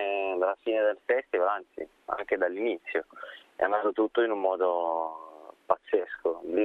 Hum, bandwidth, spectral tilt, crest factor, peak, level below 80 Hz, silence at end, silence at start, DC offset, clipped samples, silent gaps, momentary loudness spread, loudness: none; 4.2 kHz; -6 dB/octave; 22 dB; -6 dBFS; -70 dBFS; 0 s; 0 s; under 0.1%; under 0.1%; none; 14 LU; -29 LUFS